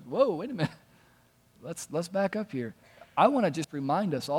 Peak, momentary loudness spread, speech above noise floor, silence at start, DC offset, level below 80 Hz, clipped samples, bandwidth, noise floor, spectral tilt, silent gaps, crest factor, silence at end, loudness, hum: -10 dBFS; 15 LU; 35 dB; 0 s; under 0.1%; -72 dBFS; under 0.1%; 17 kHz; -63 dBFS; -6 dB/octave; none; 20 dB; 0 s; -29 LUFS; none